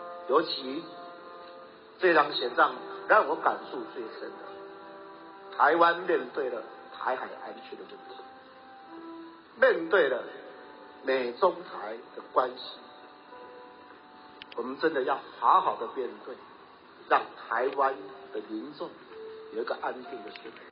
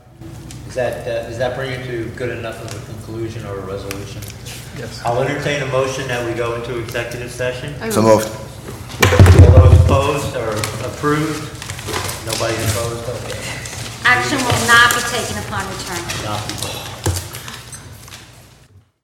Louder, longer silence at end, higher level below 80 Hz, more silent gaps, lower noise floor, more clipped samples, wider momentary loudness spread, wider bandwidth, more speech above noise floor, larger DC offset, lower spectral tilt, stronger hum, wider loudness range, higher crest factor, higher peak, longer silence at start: second, -28 LUFS vs -17 LUFS; second, 0 s vs 0.6 s; second, -82 dBFS vs -28 dBFS; neither; first, -52 dBFS vs -48 dBFS; second, under 0.1% vs 0.3%; first, 23 LU vs 20 LU; second, 5.2 kHz vs 16.5 kHz; second, 24 dB vs 29 dB; neither; second, -0.5 dB/octave vs -5 dB/octave; neither; second, 7 LU vs 13 LU; about the same, 22 dB vs 18 dB; second, -8 dBFS vs 0 dBFS; second, 0 s vs 0.2 s